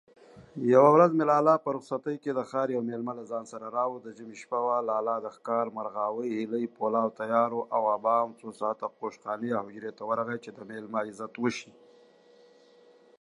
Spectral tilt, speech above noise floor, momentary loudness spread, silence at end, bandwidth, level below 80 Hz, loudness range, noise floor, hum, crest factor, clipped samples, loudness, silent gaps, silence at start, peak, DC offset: -7 dB/octave; 30 dB; 15 LU; 1.55 s; 11 kHz; -80 dBFS; 9 LU; -58 dBFS; none; 22 dB; under 0.1%; -28 LUFS; none; 0.35 s; -6 dBFS; under 0.1%